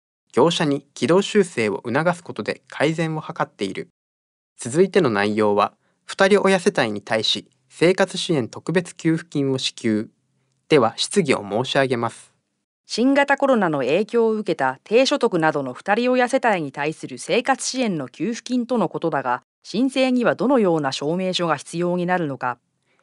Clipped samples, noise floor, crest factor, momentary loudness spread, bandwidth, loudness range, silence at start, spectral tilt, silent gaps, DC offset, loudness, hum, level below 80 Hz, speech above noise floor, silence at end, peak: under 0.1%; -68 dBFS; 18 dB; 9 LU; 11.5 kHz; 3 LU; 0.35 s; -5 dB/octave; 3.90-4.56 s, 12.64-12.84 s, 19.44-19.62 s; under 0.1%; -21 LUFS; none; -70 dBFS; 48 dB; 0.5 s; -2 dBFS